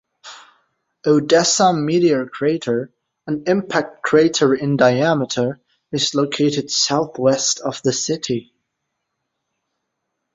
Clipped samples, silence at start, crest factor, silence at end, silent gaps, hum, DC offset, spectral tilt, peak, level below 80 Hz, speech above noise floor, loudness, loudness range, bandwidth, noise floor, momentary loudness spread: under 0.1%; 0.25 s; 18 dB; 1.9 s; none; none; under 0.1%; -4 dB/octave; -2 dBFS; -60 dBFS; 59 dB; -18 LUFS; 3 LU; 8 kHz; -76 dBFS; 10 LU